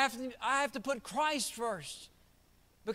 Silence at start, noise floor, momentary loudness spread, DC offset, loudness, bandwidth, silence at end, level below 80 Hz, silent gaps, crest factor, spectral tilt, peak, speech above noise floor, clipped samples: 0 s; -66 dBFS; 13 LU; under 0.1%; -35 LUFS; 16 kHz; 0 s; -68 dBFS; none; 22 dB; -2 dB/octave; -16 dBFS; 31 dB; under 0.1%